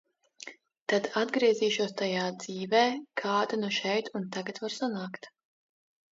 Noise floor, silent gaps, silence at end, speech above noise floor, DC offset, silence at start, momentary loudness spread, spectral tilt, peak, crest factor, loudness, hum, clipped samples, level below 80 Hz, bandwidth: -50 dBFS; 0.81-0.86 s; 0.85 s; 20 dB; under 0.1%; 0.45 s; 15 LU; -4 dB/octave; -12 dBFS; 20 dB; -30 LUFS; none; under 0.1%; -82 dBFS; 7.8 kHz